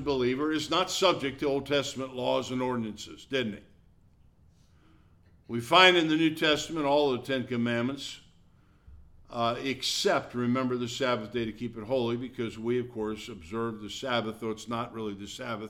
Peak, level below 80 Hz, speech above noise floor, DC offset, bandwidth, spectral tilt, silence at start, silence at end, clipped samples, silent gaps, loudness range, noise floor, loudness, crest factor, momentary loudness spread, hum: -6 dBFS; -60 dBFS; 31 dB; under 0.1%; 16.5 kHz; -4 dB/octave; 0 s; 0 s; under 0.1%; none; 9 LU; -60 dBFS; -29 LUFS; 24 dB; 13 LU; none